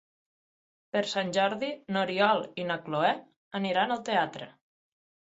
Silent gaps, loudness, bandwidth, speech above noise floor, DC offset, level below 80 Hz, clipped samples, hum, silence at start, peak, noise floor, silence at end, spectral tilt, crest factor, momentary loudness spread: 3.36-3.51 s; -29 LUFS; 8 kHz; over 61 dB; under 0.1%; -76 dBFS; under 0.1%; none; 0.95 s; -10 dBFS; under -90 dBFS; 0.9 s; -4.5 dB/octave; 22 dB; 9 LU